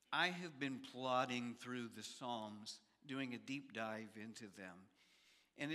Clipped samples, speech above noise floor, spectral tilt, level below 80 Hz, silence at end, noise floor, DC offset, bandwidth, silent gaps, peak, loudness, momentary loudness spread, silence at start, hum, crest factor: under 0.1%; 27 dB; -4 dB/octave; under -90 dBFS; 0 s; -73 dBFS; under 0.1%; 14.5 kHz; none; -22 dBFS; -46 LUFS; 15 LU; 0.1 s; none; 24 dB